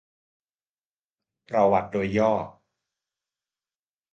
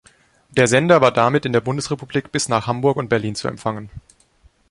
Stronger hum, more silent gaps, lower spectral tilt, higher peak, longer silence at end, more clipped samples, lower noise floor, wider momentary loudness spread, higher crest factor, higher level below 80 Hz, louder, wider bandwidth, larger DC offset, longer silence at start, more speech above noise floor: neither; neither; first, -7.5 dB/octave vs -5 dB/octave; second, -6 dBFS vs 0 dBFS; first, 1.6 s vs 0.7 s; neither; first, under -90 dBFS vs -55 dBFS; second, 8 LU vs 12 LU; about the same, 22 dB vs 18 dB; second, -58 dBFS vs -50 dBFS; second, -24 LUFS vs -18 LUFS; second, 7.6 kHz vs 11.5 kHz; neither; first, 1.5 s vs 0.55 s; first, over 67 dB vs 37 dB